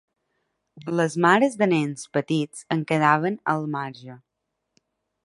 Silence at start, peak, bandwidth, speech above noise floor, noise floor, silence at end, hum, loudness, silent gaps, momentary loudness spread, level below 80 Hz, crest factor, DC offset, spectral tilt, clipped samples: 0.75 s; -4 dBFS; 11.5 kHz; 57 dB; -80 dBFS; 1.1 s; none; -23 LUFS; none; 12 LU; -70 dBFS; 22 dB; under 0.1%; -6 dB/octave; under 0.1%